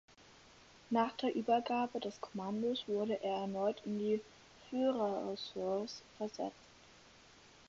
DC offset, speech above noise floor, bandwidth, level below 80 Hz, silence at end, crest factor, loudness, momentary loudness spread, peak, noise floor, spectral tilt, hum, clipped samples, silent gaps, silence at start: under 0.1%; 25 dB; 7.6 kHz; -76 dBFS; 1.15 s; 18 dB; -38 LUFS; 10 LU; -20 dBFS; -62 dBFS; -4 dB/octave; none; under 0.1%; none; 0.6 s